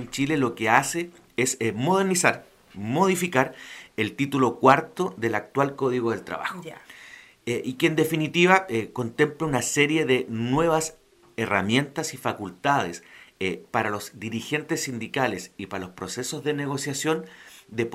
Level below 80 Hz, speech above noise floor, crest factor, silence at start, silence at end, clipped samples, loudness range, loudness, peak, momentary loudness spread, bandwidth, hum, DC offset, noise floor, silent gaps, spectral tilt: -60 dBFS; 23 dB; 24 dB; 0 s; 0 s; under 0.1%; 6 LU; -25 LUFS; -2 dBFS; 14 LU; 16 kHz; none; under 0.1%; -48 dBFS; none; -4.5 dB/octave